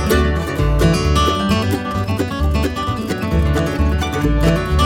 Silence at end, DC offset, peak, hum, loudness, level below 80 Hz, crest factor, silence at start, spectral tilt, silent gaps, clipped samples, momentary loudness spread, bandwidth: 0 s; under 0.1%; -2 dBFS; none; -17 LUFS; -20 dBFS; 14 dB; 0 s; -6 dB/octave; none; under 0.1%; 5 LU; 17 kHz